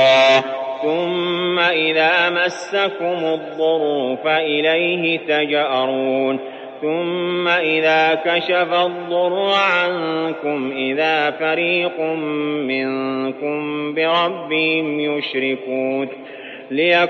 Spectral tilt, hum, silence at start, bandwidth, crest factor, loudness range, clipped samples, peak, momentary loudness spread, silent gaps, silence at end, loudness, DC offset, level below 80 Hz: -5 dB/octave; none; 0 s; 8.4 kHz; 16 dB; 3 LU; under 0.1%; -2 dBFS; 8 LU; none; 0 s; -18 LUFS; under 0.1%; -72 dBFS